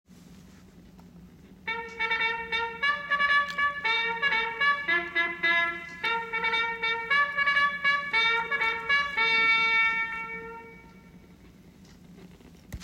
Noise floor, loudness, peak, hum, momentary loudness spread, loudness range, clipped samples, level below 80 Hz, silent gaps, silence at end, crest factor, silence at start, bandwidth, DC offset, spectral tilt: -52 dBFS; -25 LUFS; -12 dBFS; none; 11 LU; 5 LU; under 0.1%; -58 dBFS; none; 0 s; 16 dB; 0.1 s; 16 kHz; under 0.1%; -2.5 dB/octave